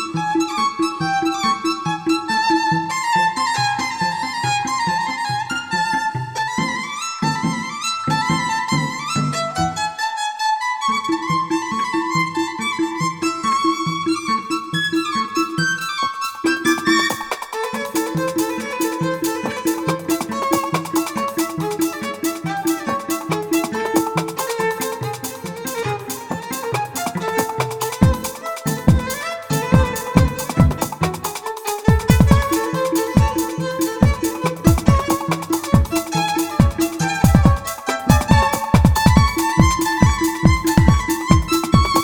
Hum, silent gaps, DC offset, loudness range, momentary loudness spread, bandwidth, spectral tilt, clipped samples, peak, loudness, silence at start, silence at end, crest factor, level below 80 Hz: none; none; under 0.1%; 6 LU; 8 LU; over 20 kHz; -5 dB/octave; under 0.1%; 0 dBFS; -19 LUFS; 0 s; 0 s; 18 dB; -30 dBFS